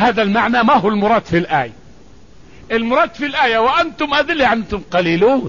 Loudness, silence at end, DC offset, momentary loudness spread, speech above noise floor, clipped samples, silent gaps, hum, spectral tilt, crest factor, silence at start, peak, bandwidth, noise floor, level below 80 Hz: -15 LUFS; 0 s; 0.7%; 6 LU; 29 dB; under 0.1%; none; none; -6 dB/octave; 12 dB; 0 s; -2 dBFS; 7.4 kHz; -44 dBFS; -42 dBFS